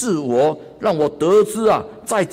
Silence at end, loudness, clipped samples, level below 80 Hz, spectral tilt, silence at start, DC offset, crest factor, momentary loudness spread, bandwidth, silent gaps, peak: 0 s; -18 LUFS; under 0.1%; -54 dBFS; -5 dB/octave; 0 s; under 0.1%; 12 dB; 6 LU; 16 kHz; none; -6 dBFS